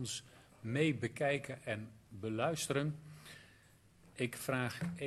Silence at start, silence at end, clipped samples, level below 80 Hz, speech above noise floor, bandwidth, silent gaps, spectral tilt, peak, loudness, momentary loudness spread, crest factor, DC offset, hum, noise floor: 0 s; 0 s; under 0.1%; -70 dBFS; 27 dB; 14 kHz; none; -5 dB/octave; -18 dBFS; -38 LUFS; 18 LU; 20 dB; under 0.1%; none; -65 dBFS